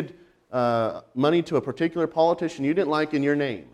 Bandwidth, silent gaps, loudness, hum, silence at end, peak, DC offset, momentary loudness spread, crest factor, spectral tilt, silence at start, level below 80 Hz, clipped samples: 10.5 kHz; none; -24 LUFS; none; 0.1 s; -8 dBFS; under 0.1%; 5 LU; 16 dB; -7 dB/octave; 0 s; -66 dBFS; under 0.1%